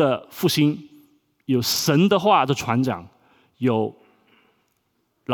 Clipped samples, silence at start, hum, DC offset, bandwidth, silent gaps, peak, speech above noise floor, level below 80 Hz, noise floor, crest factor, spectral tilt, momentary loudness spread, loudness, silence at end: under 0.1%; 0 s; none; under 0.1%; over 20 kHz; none; -4 dBFS; 50 dB; -62 dBFS; -70 dBFS; 18 dB; -5 dB/octave; 14 LU; -21 LUFS; 0 s